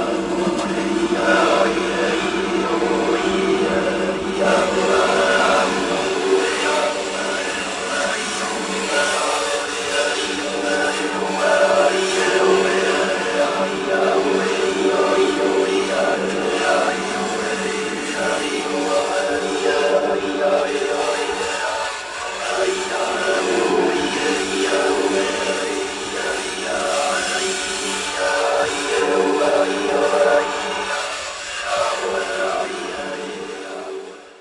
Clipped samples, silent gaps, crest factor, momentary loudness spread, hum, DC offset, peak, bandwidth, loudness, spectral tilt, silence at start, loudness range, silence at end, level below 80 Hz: under 0.1%; none; 16 dB; 7 LU; none; under 0.1%; -2 dBFS; 11.5 kHz; -19 LUFS; -3 dB/octave; 0 s; 3 LU; 0.05 s; -52 dBFS